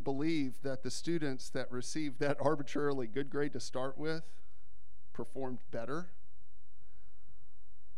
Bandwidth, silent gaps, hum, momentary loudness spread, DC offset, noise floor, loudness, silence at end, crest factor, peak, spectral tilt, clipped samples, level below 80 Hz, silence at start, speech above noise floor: 15 kHz; none; none; 9 LU; 3%; -67 dBFS; -38 LUFS; 1.9 s; 22 dB; -18 dBFS; -5.5 dB/octave; under 0.1%; -68 dBFS; 0 s; 29 dB